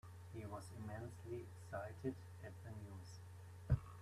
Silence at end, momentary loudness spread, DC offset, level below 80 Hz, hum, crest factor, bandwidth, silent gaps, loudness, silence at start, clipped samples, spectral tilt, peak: 0 s; 14 LU; under 0.1%; -60 dBFS; none; 24 dB; 14 kHz; none; -50 LUFS; 0.05 s; under 0.1%; -7.5 dB/octave; -24 dBFS